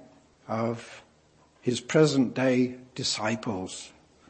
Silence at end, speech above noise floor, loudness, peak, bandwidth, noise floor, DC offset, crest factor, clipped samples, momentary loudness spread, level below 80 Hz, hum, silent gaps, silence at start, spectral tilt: 0.4 s; 34 dB; -27 LUFS; -8 dBFS; 8.8 kHz; -61 dBFS; under 0.1%; 20 dB; under 0.1%; 16 LU; -68 dBFS; none; none; 0.5 s; -5 dB/octave